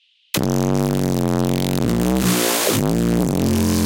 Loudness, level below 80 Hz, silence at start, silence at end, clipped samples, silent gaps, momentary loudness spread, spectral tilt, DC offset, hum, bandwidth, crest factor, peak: -19 LUFS; -36 dBFS; 0.35 s; 0 s; under 0.1%; none; 3 LU; -5 dB/octave; under 0.1%; none; 17 kHz; 16 dB; -2 dBFS